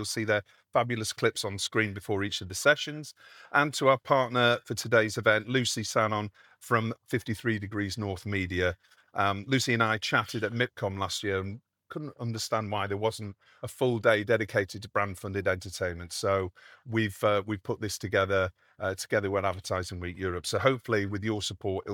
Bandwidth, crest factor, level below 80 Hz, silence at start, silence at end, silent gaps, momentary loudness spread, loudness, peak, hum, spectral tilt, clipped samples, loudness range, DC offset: 19 kHz; 22 dB; -66 dBFS; 0 s; 0 s; none; 9 LU; -29 LUFS; -8 dBFS; none; -4.5 dB/octave; under 0.1%; 5 LU; under 0.1%